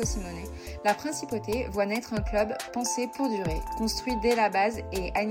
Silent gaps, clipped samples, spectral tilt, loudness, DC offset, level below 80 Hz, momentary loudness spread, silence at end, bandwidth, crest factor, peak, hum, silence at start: none; under 0.1%; -4 dB/octave; -29 LUFS; under 0.1%; -40 dBFS; 8 LU; 0 s; 16.5 kHz; 16 dB; -12 dBFS; none; 0 s